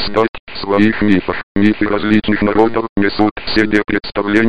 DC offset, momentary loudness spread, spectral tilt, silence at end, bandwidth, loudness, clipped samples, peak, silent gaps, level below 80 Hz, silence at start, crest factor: 2%; 5 LU; -7 dB/octave; 0 s; 8 kHz; -15 LUFS; under 0.1%; 0 dBFS; 0.29-0.33 s, 0.40-0.47 s, 1.43-1.55 s, 2.89-2.96 s, 3.31-3.36 s; -36 dBFS; 0 s; 14 dB